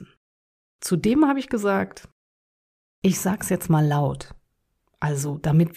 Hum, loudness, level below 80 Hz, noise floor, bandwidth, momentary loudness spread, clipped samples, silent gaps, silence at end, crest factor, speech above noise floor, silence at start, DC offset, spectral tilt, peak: none; -23 LUFS; -52 dBFS; -72 dBFS; 15.5 kHz; 11 LU; under 0.1%; 0.17-0.79 s, 2.12-3.02 s; 0.05 s; 16 dB; 51 dB; 0 s; under 0.1%; -6.5 dB/octave; -8 dBFS